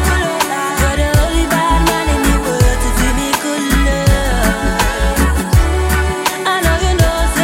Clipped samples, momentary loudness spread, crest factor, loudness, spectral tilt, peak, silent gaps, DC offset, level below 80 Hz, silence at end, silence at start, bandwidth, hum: under 0.1%; 3 LU; 12 dB; -14 LUFS; -4.5 dB/octave; -2 dBFS; none; under 0.1%; -16 dBFS; 0 s; 0 s; 16.5 kHz; none